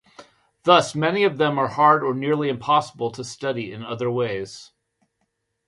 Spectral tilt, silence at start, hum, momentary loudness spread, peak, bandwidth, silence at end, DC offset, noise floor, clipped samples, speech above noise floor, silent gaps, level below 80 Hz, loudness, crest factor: -5 dB/octave; 0.2 s; none; 13 LU; 0 dBFS; 11.5 kHz; 1.05 s; under 0.1%; -74 dBFS; under 0.1%; 53 dB; none; -64 dBFS; -21 LUFS; 22 dB